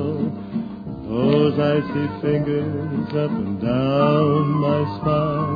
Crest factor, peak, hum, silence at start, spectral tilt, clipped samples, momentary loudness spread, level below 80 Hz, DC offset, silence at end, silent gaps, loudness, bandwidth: 16 dB; -4 dBFS; none; 0 s; -10 dB/octave; under 0.1%; 10 LU; -48 dBFS; under 0.1%; 0 s; none; -21 LUFS; 5 kHz